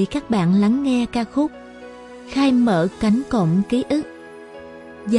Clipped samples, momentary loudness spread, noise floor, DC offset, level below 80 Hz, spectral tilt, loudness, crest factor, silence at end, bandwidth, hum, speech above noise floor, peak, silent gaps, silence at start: under 0.1%; 22 LU; -38 dBFS; under 0.1%; -48 dBFS; -7 dB/octave; -19 LUFS; 16 dB; 0 s; 11 kHz; none; 20 dB; -4 dBFS; none; 0 s